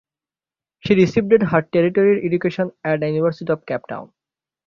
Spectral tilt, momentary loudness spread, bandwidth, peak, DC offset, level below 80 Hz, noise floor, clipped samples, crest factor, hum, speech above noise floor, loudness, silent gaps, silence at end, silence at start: -8 dB/octave; 11 LU; 7.2 kHz; -2 dBFS; under 0.1%; -56 dBFS; under -90 dBFS; under 0.1%; 18 dB; none; over 72 dB; -18 LUFS; none; 0.6 s; 0.85 s